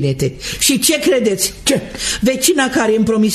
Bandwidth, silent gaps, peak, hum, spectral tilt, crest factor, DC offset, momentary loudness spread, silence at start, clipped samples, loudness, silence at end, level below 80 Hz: 14.5 kHz; none; 0 dBFS; none; -3.5 dB/octave; 16 dB; under 0.1%; 6 LU; 0 s; under 0.1%; -14 LUFS; 0 s; -38 dBFS